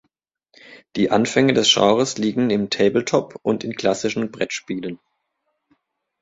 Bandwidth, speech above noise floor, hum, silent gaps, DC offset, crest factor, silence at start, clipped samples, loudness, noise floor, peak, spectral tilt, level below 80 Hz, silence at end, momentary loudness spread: 8 kHz; 55 dB; none; none; under 0.1%; 20 dB; 0.7 s; under 0.1%; -19 LUFS; -74 dBFS; -2 dBFS; -4 dB/octave; -58 dBFS; 1.25 s; 13 LU